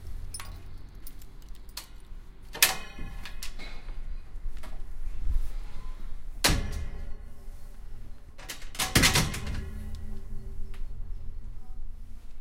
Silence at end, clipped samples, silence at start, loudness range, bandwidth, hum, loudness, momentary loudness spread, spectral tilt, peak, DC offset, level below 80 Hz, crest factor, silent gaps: 0 s; under 0.1%; 0 s; 11 LU; 16.5 kHz; none; -29 LUFS; 26 LU; -2.5 dB/octave; -2 dBFS; under 0.1%; -36 dBFS; 28 dB; none